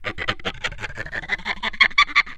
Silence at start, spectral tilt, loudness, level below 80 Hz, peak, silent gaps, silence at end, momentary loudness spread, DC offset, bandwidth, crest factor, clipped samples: 0 s; -2 dB/octave; -21 LUFS; -40 dBFS; 0 dBFS; none; 0 s; 14 LU; under 0.1%; 12 kHz; 22 dB; under 0.1%